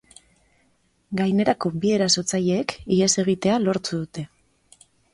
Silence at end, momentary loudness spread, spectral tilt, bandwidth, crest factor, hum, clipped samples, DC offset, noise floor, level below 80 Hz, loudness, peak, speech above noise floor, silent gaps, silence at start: 0.85 s; 11 LU; -4.5 dB/octave; 11.5 kHz; 18 dB; none; under 0.1%; under 0.1%; -65 dBFS; -56 dBFS; -22 LUFS; -6 dBFS; 43 dB; none; 1.1 s